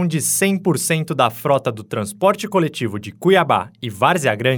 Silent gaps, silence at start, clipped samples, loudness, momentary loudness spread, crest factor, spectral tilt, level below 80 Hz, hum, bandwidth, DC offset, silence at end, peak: none; 0 s; under 0.1%; -18 LUFS; 9 LU; 18 dB; -4.5 dB/octave; -64 dBFS; none; over 20 kHz; under 0.1%; 0 s; 0 dBFS